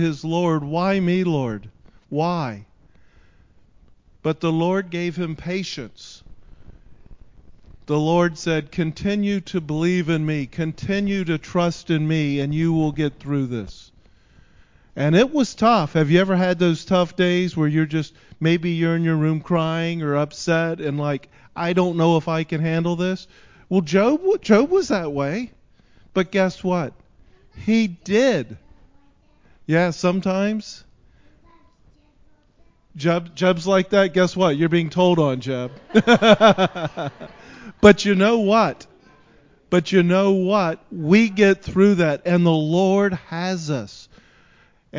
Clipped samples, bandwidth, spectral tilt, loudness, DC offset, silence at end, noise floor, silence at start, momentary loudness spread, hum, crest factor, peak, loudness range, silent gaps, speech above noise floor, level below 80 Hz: under 0.1%; 7.6 kHz; -6.5 dB/octave; -20 LUFS; under 0.1%; 0 s; -55 dBFS; 0 s; 12 LU; none; 20 dB; 0 dBFS; 9 LU; none; 36 dB; -50 dBFS